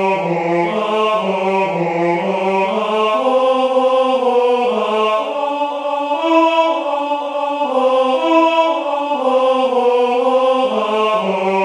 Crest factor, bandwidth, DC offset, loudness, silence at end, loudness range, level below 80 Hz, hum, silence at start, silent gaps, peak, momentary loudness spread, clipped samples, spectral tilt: 14 dB; 10.5 kHz; under 0.1%; -16 LUFS; 0 s; 2 LU; -66 dBFS; none; 0 s; none; -2 dBFS; 5 LU; under 0.1%; -5.5 dB/octave